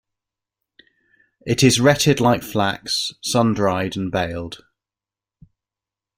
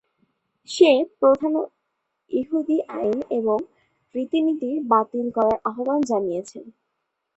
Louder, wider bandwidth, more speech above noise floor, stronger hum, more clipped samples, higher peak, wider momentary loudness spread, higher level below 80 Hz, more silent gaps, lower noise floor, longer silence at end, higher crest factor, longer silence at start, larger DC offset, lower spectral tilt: first, -19 LUFS vs -22 LUFS; first, 16 kHz vs 8.4 kHz; first, 71 dB vs 56 dB; neither; neither; about the same, -2 dBFS vs -2 dBFS; about the same, 14 LU vs 14 LU; first, -52 dBFS vs -64 dBFS; neither; first, -90 dBFS vs -77 dBFS; first, 1.6 s vs 0.65 s; about the same, 20 dB vs 20 dB; first, 1.45 s vs 0.7 s; neither; about the same, -4.5 dB/octave vs -5 dB/octave